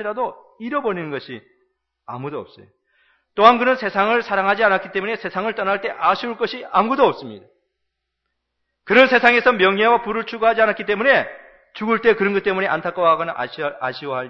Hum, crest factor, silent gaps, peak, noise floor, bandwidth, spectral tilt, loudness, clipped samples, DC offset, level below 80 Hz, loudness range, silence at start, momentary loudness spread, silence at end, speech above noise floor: none; 20 dB; none; 0 dBFS; -76 dBFS; 7 kHz; -6 dB/octave; -18 LUFS; under 0.1%; under 0.1%; -60 dBFS; 6 LU; 0 s; 17 LU; 0 s; 58 dB